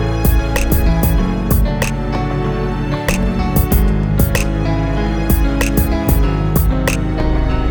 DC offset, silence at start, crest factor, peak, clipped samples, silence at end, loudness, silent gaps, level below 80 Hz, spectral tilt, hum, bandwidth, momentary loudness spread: under 0.1%; 0 s; 14 dB; 0 dBFS; under 0.1%; 0 s; -16 LUFS; none; -18 dBFS; -6 dB/octave; none; over 20 kHz; 4 LU